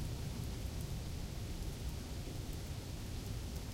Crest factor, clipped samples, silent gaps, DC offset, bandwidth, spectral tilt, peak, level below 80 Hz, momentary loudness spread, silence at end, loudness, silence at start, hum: 12 dB; under 0.1%; none; under 0.1%; 16.5 kHz; -5 dB/octave; -30 dBFS; -46 dBFS; 2 LU; 0 s; -44 LUFS; 0 s; none